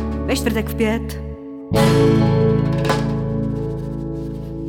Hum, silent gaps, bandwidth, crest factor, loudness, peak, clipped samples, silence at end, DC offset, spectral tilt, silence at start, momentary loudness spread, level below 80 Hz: none; none; 17.5 kHz; 16 dB; -19 LUFS; -2 dBFS; under 0.1%; 0 s; under 0.1%; -7 dB/octave; 0 s; 14 LU; -32 dBFS